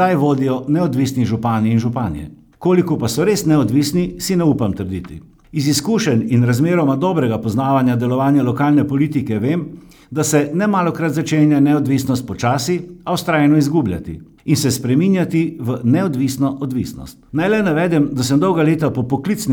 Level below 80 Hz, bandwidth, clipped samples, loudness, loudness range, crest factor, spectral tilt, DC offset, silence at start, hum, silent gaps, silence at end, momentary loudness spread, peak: -46 dBFS; 20 kHz; under 0.1%; -17 LUFS; 2 LU; 16 dB; -6 dB/octave; under 0.1%; 0 s; none; none; 0 s; 8 LU; -2 dBFS